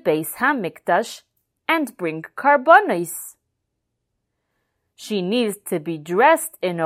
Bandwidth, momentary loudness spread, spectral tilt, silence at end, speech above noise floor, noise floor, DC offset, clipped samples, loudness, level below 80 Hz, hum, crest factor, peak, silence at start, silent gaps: 16 kHz; 17 LU; -4 dB/octave; 0 s; 57 dB; -77 dBFS; under 0.1%; under 0.1%; -19 LUFS; -74 dBFS; none; 20 dB; 0 dBFS; 0.05 s; none